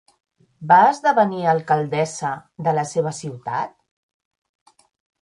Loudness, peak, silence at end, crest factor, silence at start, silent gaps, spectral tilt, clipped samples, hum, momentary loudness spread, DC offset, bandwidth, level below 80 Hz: -20 LUFS; -2 dBFS; 1.55 s; 20 dB; 0.6 s; none; -5.5 dB/octave; under 0.1%; none; 14 LU; under 0.1%; 11.5 kHz; -66 dBFS